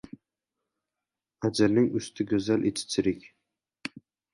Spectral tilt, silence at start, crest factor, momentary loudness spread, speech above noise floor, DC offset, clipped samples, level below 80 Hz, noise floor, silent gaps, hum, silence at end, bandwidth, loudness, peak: -5.5 dB/octave; 1.4 s; 20 dB; 17 LU; 63 dB; under 0.1%; under 0.1%; -60 dBFS; -89 dBFS; none; none; 0.45 s; 11.5 kHz; -27 LUFS; -10 dBFS